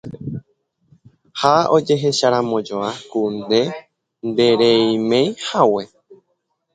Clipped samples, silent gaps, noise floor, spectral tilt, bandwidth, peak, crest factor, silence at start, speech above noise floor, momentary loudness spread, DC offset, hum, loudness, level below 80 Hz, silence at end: under 0.1%; none; -70 dBFS; -5 dB/octave; 9.4 kHz; 0 dBFS; 18 dB; 0.05 s; 54 dB; 16 LU; under 0.1%; none; -17 LUFS; -60 dBFS; 0.6 s